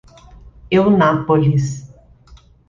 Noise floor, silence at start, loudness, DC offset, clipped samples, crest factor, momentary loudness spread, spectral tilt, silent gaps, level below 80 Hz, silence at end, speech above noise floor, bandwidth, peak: -46 dBFS; 0.45 s; -15 LUFS; under 0.1%; under 0.1%; 16 dB; 11 LU; -7.5 dB/octave; none; -44 dBFS; 0.35 s; 32 dB; 7.6 kHz; -2 dBFS